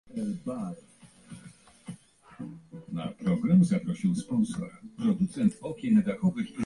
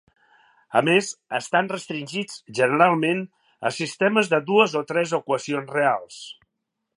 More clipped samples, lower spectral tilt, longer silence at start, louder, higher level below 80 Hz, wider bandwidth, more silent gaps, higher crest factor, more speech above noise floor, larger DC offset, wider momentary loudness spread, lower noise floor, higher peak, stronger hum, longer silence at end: neither; first, -8 dB/octave vs -4.5 dB/octave; second, 0.1 s vs 0.7 s; second, -28 LUFS vs -22 LUFS; first, -62 dBFS vs -76 dBFS; about the same, 11.5 kHz vs 11.5 kHz; neither; second, 16 dB vs 22 dB; second, 25 dB vs 57 dB; neither; first, 23 LU vs 12 LU; second, -53 dBFS vs -80 dBFS; second, -12 dBFS vs -2 dBFS; neither; second, 0 s vs 0.65 s